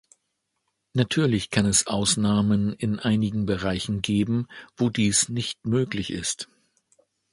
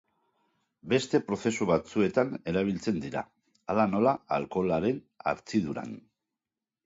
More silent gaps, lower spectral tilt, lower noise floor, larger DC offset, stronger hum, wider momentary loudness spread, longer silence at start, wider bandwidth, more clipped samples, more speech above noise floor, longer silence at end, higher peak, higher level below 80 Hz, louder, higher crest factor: neither; second, -4.5 dB/octave vs -6 dB/octave; second, -78 dBFS vs under -90 dBFS; neither; neither; about the same, 8 LU vs 10 LU; about the same, 0.95 s vs 0.85 s; first, 11.5 kHz vs 7.8 kHz; neither; second, 54 dB vs over 62 dB; about the same, 0.9 s vs 0.85 s; first, -4 dBFS vs -10 dBFS; first, -50 dBFS vs -60 dBFS; first, -24 LUFS vs -29 LUFS; about the same, 20 dB vs 20 dB